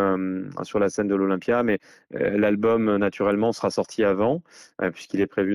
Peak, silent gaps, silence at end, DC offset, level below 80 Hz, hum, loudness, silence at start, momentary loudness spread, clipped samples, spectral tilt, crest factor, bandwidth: -12 dBFS; none; 0 s; under 0.1%; -62 dBFS; none; -24 LUFS; 0 s; 8 LU; under 0.1%; -6.5 dB/octave; 12 dB; 11.5 kHz